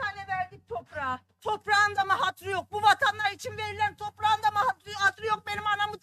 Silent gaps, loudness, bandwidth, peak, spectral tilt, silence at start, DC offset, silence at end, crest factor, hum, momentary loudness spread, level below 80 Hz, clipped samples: none; -27 LUFS; 13 kHz; -8 dBFS; -2 dB/octave; 0 s; under 0.1%; 0.05 s; 20 dB; none; 11 LU; -66 dBFS; under 0.1%